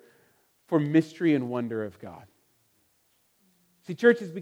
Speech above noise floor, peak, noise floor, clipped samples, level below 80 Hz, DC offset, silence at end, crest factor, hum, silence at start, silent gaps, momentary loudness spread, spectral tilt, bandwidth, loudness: 43 dB; -6 dBFS; -69 dBFS; under 0.1%; -78 dBFS; under 0.1%; 0 s; 22 dB; none; 0.7 s; none; 18 LU; -7.5 dB/octave; 11.5 kHz; -26 LUFS